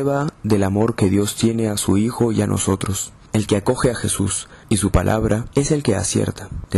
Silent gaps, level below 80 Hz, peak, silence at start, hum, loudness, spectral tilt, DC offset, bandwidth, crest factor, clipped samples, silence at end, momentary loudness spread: none; -36 dBFS; -6 dBFS; 0 s; none; -19 LUFS; -5.5 dB/octave; under 0.1%; 13.5 kHz; 12 dB; under 0.1%; 0 s; 5 LU